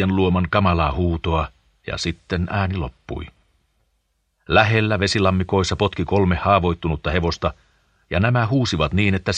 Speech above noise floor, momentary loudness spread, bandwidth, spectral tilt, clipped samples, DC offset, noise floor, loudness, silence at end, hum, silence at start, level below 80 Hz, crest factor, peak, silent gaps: 50 dB; 11 LU; 9.4 kHz; -6 dB/octave; under 0.1%; under 0.1%; -69 dBFS; -20 LUFS; 0 s; none; 0 s; -36 dBFS; 20 dB; 0 dBFS; none